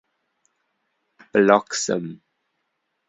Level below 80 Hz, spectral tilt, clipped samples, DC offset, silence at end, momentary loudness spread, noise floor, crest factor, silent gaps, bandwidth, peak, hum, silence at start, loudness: -66 dBFS; -4 dB/octave; under 0.1%; under 0.1%; 0.95 s; 11 LU; -75 dBFS; 22 dB; none; 8.4 kHz; -2 dBFS; none; 1.35 s; -20 LUFS